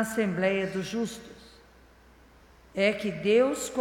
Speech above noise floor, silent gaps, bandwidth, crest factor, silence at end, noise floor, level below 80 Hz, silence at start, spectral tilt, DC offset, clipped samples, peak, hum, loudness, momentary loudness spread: 29 dB; none; 17.5 kHz; 18 dB; 0 s; -56 dBFS; -60 dBFS; 0 s; -5 dB/octave; under 0.1%; under 0.1%; -10 dBFS; none; -27 LUFS; 15 LU